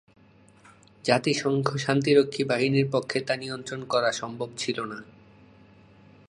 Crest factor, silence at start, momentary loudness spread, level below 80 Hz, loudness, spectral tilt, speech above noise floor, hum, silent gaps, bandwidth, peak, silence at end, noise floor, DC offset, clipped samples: 24 dB; 1.05 s; 12 LU; -68 dBFS; -26 LUFS; -5 dB/octave; 30 dB; none; none; 10.5 kHz; -4 dBFS; 1.25 s; -56 dBFS; under 0.1%; under 0.1%